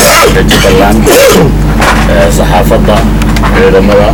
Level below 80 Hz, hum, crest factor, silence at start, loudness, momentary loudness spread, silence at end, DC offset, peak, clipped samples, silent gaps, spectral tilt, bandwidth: -12 dBFS; 50 Hz at -10 dBFS; 4 dB; 0 s; -5 LUFS; 5 LU; 0 s; 0.7%; 0 dBFS; 8%; none; -4.5 dB/octave; over 20 kHz